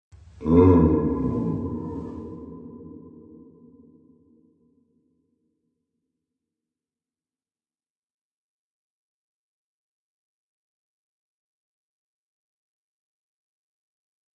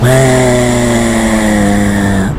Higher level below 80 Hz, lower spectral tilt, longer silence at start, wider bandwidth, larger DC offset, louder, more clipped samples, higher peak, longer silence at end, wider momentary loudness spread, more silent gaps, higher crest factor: second, -48 dBFS vs -24 dBFS; first, -11.5 dB/octave vs -5.5 dB/octave; first, 0.4 s vs 0 s; second, 3.9 kHz vs 16 kHz; neither; second, -21 LUFS vs -10 LUFS; neither; second, -4 dBFS vs 0 dBFS; first, 11.25 s vs 0 s; first, 26 LU vs 3 LU; neither; first, 26 dB vs 10 dB